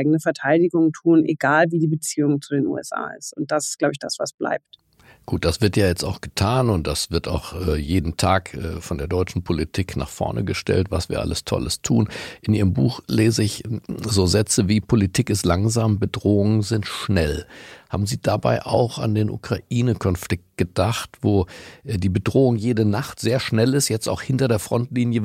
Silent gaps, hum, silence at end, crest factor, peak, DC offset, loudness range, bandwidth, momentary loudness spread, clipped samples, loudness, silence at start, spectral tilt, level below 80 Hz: 4.34-4.38 s; none; 0 s; 18 dB; -4 dBFS; under 0.1%; 4 LU; 16 kHz; 9 LU; under 0.1%; -21 LUFS; 0 s; -5.5 dB/octave; -40 dBFS